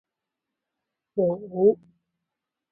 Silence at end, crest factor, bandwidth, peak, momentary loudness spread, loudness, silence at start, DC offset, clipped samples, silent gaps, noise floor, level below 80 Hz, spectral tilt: 0.95 s; 20 dB; 1.3 kHz; -8 dBFS; 11 LU; -25 LUFS; 1.15 s; under 0.1%; under 0.1%; none; -86 dBFS; -70 dBFS; -14.5 dB/octave